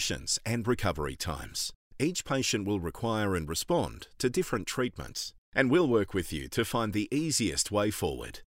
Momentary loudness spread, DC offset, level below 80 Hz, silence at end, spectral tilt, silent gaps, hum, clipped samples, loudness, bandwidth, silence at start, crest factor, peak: 7 LU; under 0.1%; -50 dBFS; 0.15 s; -4 dB/octave; 1.75-1.91 s, 5.38-5.52 s; none; under 0.1%; -30 LUFS; 16 kHz; 0 s; 20 dB; -10 dBFS